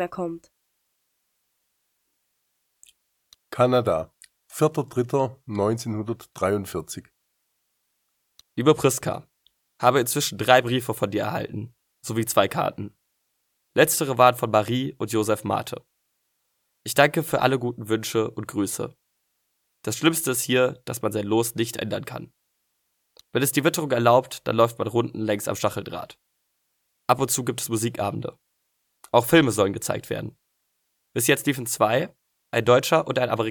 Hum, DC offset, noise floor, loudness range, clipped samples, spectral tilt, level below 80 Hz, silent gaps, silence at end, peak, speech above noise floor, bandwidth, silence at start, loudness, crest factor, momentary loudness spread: none; under 0.1%; -74 dBFS; 5 LU; under 0.1%; -4.5 dB/octave; -62 dBFS; none; 0 s; 0 dBFS; 51 dB; 19 kHz; 0 s; -23 LUFS; 24 dB; 16 LU